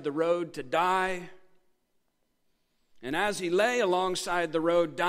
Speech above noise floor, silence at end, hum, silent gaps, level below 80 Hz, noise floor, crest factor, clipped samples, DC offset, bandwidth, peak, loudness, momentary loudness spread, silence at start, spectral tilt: 46 dB; 0 s; none; none; -62 dBFS; -74 dBFS; 18 dB; under 0.1%; under 0.1%; 16 kHz; -12 dBFS; -28 LUFS; 7 LU; 0 s; -4 dB/octave